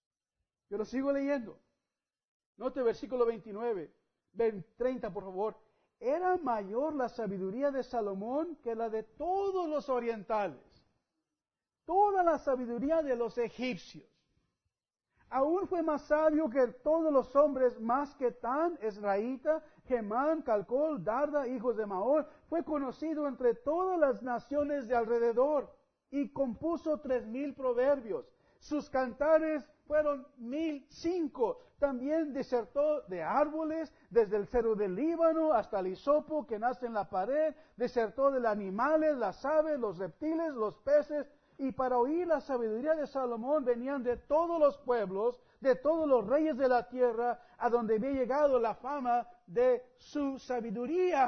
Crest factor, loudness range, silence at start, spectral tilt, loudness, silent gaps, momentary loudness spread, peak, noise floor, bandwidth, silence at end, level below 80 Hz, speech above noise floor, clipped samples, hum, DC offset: 18 dB; 5 LU; 0.7 s; -7 dB/octave; -33 LUFS; 2.28-2.40 s, 2.46-2.53 s; 9 LU; -14 dBFS; under -90 dBFS; 6.4 kHz; 0 s; -62 dBFS; over 58 dB; under 0.1%; none; under 0.1%